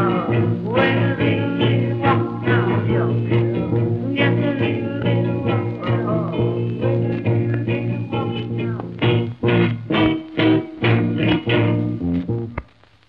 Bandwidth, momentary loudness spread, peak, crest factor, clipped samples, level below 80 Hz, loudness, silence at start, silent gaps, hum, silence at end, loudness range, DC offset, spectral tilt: 4.9 kHz; 6 LU; -2 dBFS; 16 dB; under 0.1%; -44 dBFS; -20 LUFS; 0 s; none; none; 0.45 s; 3 LU; 0.1%; -10 dB/octave